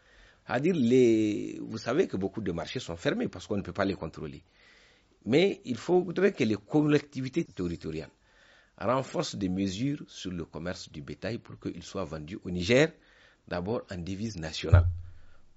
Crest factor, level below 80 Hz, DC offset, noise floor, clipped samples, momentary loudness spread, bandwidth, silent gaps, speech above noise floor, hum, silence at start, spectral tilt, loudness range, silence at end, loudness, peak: 22 dB; -48 dBFS; under 0.1%; -61 dBFS; under 0.1%; 14 LU; 8 kHz; none; 32 dB; none; 0.5 s; -6 dB/octave; 5 LU; 0.25 s; -30 LUFS; -8 dBFS